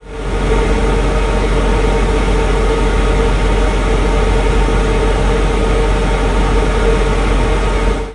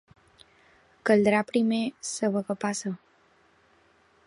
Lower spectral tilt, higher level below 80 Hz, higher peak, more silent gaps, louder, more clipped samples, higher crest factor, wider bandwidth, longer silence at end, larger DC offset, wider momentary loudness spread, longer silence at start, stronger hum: about the same, -6 dB/octave vs -5 dB/octave; first, -14 dBFS vs -68 dBFS; first, 0 dBFS vs -8 dBFS; neither; first, -15 LUFS vs -26 LUFS; neither; second, 12 dB vs 20 dB; about the same, 11 kHz vs 11.5 kHz; second, 0 s vs 1.3 s; neither; second, 1 LU vs 11 LU; second, 0.05 s vs 1.05 s; neither